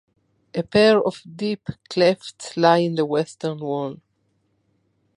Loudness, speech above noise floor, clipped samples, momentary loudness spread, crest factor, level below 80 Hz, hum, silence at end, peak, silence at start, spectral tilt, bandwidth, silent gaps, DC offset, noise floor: -21 LUFS; 48 dB; under 0.1%; 14 LU; 20 dB; -60 dBFS; none; 1.2 s; -2 dBFS; 0.55 s; -5.5 dB/octave; 11 kHz; none; under 0.1%; -68 dBFS